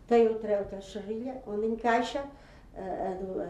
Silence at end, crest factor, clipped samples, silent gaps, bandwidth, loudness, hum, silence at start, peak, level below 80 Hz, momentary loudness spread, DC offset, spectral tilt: 0 s; 18 dB; under 0.1%; none; 8.8 kHz; -31 LUFS; none; 0.05 s; -12 dBFS; -56 dBFS; 15 LU; under 0.1%; -5.5 dB/octave